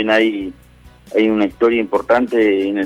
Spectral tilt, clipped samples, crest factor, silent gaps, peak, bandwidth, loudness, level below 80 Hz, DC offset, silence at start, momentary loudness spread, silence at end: -6 dB/octave; under 0.1%; 12 dB; none; -4 dBFS; 11.5 kHz; -16 LUFS; -48 dBFS; under 0.1%; 0 s; 7 LU; 0 s